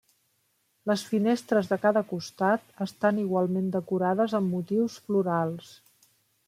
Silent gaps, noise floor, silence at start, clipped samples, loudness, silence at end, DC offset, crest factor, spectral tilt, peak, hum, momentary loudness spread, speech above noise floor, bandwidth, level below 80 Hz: none; -72 dBFS; 0.85 s; under 0.1%; -27 LUFS; 0.75 s; under 0.1%; 18 dB; -6.5 dB/octave; -10 dBFS; none; 5 LU; 45 dB; 15 kHz; -74 dBFS